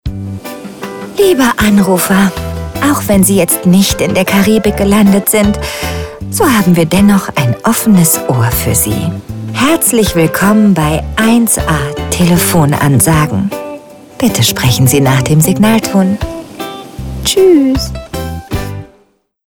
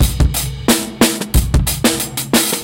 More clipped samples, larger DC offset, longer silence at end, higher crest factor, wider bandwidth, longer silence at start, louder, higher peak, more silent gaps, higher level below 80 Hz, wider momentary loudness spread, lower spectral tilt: neither; neither; first, 0.6 s vs 0 s; about the same, 10 dB vs 14 dB; about the same, 19 kHz vs 17.5 kHz; about the same, 0.05 s vs 0 s; first, -10 LUFS vs -15 LUFS; about the same, 0 dBFS vs 0 dBFS; neither; second, -28 dBFS vs -20 dBFS; first, 14 LU vs 3 LU; about the same, -5 dB/octave vs -4 dB/octave